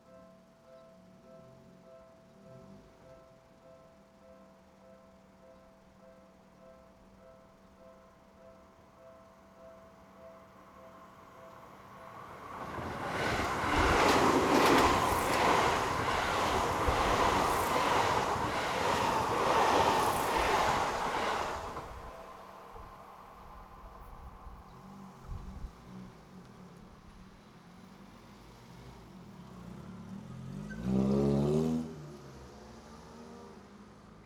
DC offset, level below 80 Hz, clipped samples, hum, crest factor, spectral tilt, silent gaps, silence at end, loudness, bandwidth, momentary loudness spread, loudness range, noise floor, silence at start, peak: under 0.1%; -50 dBFS; under 0.1%; none; 22 dB; -4.5 dB/octave; none; 0.05 s; -30 LUFS; over 20 kHz; 27 LU; 24 LU; -59 dBFS; 0.15 s; -14 dBFS